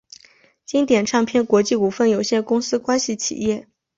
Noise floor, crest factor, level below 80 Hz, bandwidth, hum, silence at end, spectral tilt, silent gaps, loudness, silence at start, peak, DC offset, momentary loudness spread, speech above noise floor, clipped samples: -54 dBFS; 16 dB; -58 dBFS; 7.8 kHz; none; 0.35 s; -4 dB/octave; none; -19 LUFS; 0.7 s; -4 dBFS; under 0.1%; 6 LU; 35 dB; under 0.1%